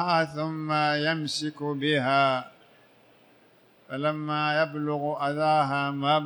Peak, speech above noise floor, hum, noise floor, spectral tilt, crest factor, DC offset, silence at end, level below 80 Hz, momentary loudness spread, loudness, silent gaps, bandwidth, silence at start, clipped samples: -10 dBFS; 33 dB; none; -59 dBFS; -5.5 dB/octave; 18 dB; under 0.1%; 0 s; -76 dBFS; 7 LU; -26 LUFS; none; 19.5 kHz; 0 s; under 0.1%